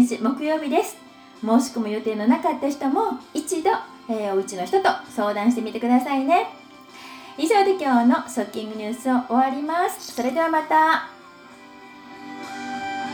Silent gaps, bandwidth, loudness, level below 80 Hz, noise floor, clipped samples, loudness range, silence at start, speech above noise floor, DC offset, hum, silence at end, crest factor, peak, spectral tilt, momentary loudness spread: none; over 20 kHz; -22 LUFS; -70 dBFS; -45 dBFS; under 0.1%; 2 LU; 0 s; 24 dB; under 0.1%; none; 0 s; 18 dB; -6 dBFS; -4 dB/octave; 15 LU